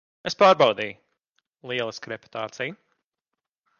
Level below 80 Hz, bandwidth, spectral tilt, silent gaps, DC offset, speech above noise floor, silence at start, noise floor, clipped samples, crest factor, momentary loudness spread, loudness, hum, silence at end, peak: -70 dBFS; 7.2 kHz; -4 dB/octave; 1.29-1.33 s; under 0.1%; 62 dB; 0.25 s; -86 dBFS; under 0.1%; 22 dB; 17 LU; -23 LUFS; none; 1.05 s; -4 dBFS